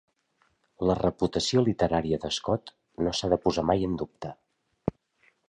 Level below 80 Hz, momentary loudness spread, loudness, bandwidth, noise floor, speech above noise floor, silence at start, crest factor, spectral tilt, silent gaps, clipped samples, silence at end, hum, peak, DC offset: -48 dBFS; 11 LU; -28 LUFS; 10.5 kHz; -71 dBFS; 44 dB; 0.8 s; 20 dB; -5.5 dB/octave; none; under 0.1%; 0.6 s; none; -8 dBFS; under 0.1%